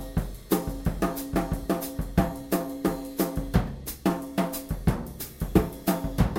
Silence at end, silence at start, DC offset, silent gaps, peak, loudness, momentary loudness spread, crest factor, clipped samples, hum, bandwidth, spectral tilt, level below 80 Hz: 0 s; 0 s; under 0.1%; none; -6 dBFS; -29 LUFS; 6 LU; 20 dB; under 0.1%; none; 16.5 kHz; -6.5 dB/octave; -36 dBFS